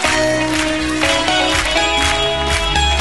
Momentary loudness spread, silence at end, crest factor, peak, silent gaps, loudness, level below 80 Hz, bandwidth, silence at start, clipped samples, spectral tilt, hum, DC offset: 3 LU; 0 s; 14 dB; -2 dBFS; none; -15 LUFS; -26 dBFS; 12 kHz; 0 s; under 0.1%; -3 dB/octave; none; 1%